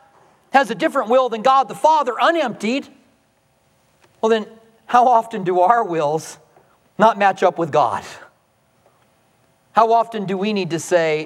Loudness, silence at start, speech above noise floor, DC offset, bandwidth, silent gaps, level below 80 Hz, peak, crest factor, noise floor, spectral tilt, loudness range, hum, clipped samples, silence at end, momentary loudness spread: -18 LUFS; 0.55 s; 44 dB; under 0.1%; 13.5 kHz; none; -72 dBFS; 0 dBFS; 18 dB; -61 dBFS; -5 dB/octave; 3 LU; none; under 0.1%; 0 s; 8 LU